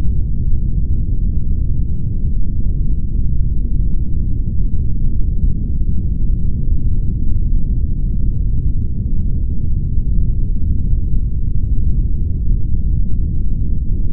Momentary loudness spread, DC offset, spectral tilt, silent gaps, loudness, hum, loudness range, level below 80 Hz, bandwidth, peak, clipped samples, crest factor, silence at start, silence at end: 2 LU; under 0.1%; -19.5 dB/octave; none; -21 LUFS; none; 1 LU; -16 dBFS; 0.7 kHz; -2 dBFS; under 0.1%; 10 dB; 0 s; 0 s